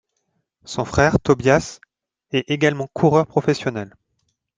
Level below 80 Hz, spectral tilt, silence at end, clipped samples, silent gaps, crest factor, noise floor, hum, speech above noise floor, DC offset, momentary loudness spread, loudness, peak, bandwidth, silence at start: -44 dBFS; -6 dB/octave; 0.7 s; under 0.1%; none; 18 dB; -72 dBFS; none; 54 dB; under 0.1%; 14 LU; -19 LUFS; -2 dBFS; 9.6 kHz; 0.7 s